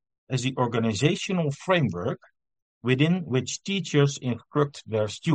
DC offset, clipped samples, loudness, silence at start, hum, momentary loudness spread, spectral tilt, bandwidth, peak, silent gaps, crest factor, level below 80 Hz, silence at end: under 0.1%; under 0.1%; -26 LUFS; 0.3 s; none; 8 LU; -5.5 dB/octave; 9.2 kHz; -6 dBFS; 2.62-2.81 s; 20 dB; -64 dBFS; 0 s